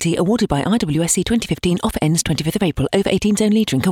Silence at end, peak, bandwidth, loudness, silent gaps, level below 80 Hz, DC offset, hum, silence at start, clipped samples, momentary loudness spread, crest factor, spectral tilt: 0 s; -2 dBFS; 17 kHz; -18 LUFS; none; -38 dBFS; under 0.1%; none; 0 s; under 0.1%; 3 LU; 14 dB; -5 dB/octave